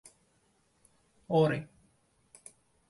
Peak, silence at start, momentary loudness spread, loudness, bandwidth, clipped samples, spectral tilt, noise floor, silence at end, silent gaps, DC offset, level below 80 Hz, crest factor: -14 dBFS; 1.3 s; 26 LU; -30 LUFS; 11.5 kHz; under 0.1%; -7 dB/octave; -71 dBFS; 1.25 s; none; under 0.1%; -70 dBFS; 22 dB